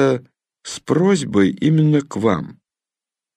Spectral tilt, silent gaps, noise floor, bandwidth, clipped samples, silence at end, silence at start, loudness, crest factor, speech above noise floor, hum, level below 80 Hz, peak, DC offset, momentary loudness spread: -6.5 dB/octave; none; -89 dBFS; 10.5 kHz; under 0.1%; 0.85 s; 0 s; -18 LUFS; 16 dB; 72 dB; none; -58 dBFS; -2 dBFS; under 0.1%; 16 LU